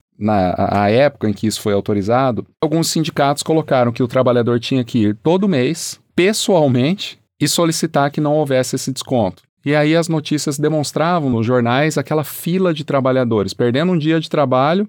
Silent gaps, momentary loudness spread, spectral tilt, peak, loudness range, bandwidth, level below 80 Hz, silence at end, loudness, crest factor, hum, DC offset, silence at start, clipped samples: 9.49-9.57 s; 5 LU; -5.5 dB/octave; -4 dBFS; 1 LU; 20 kHz; -58 dBFS; 0 s; -16 LUFS; 12 dB; none; under 0.1%; 0.2 s; under 0.1%